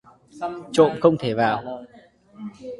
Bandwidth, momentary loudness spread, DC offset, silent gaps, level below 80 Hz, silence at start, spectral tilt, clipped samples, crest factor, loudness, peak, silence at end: 11.5 kHz; 21 LU; under 0.1%; none; -60 dBFS; 0.35 s; -6 dB/octave; under 0.1%; 22 dB; -21 LUFS; -2 dBFS; 0.05 s